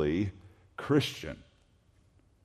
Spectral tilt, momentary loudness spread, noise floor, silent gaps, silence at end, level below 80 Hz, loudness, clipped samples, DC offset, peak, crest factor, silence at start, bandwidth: -6 dB/octave; 19 LU; -65 dBFS; none; 1.05 s; -58 dBFS; -32 LUFS; under 0.1%; under 0.1%; -14 dBFS; 20 dB; 0 s; 14 kHz